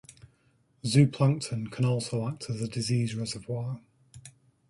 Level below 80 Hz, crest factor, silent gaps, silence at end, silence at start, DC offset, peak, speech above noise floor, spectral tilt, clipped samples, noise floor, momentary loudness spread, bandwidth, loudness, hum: -62 dBFS; 20 dB; none; 0.4 s; 0.1 s; under 0.1%; -8 dBFS; 40 dB; -6 dB/octave; under 0.1%; -67 dBFS; 11 LU; 11.5 kHz; -29 LUFS; none